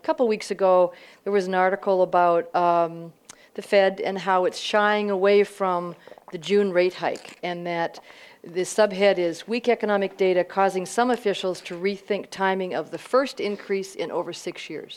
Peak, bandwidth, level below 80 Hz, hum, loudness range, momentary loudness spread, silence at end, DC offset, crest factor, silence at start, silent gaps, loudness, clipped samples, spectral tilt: -6 dBFS; 13.5 kHz; -74 dBFS; none; 4 LU; 12 LU; 0 s; under 0.1%; 16 dB; 0.05 s; none; -23 LUFS; under 0.1%; -4.5 dB/octave